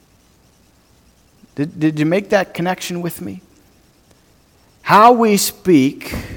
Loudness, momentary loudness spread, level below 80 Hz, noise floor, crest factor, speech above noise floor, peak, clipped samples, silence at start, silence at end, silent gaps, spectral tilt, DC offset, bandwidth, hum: -15 LUFS; 20 LU; -48 dBFS; -53 dBFS; 18 dB; 38 dB; 0 dBFS; under 0.1%; 1.6 s; 0 s; none; -5 dB/octave; under 0.1%; 19 kHz; none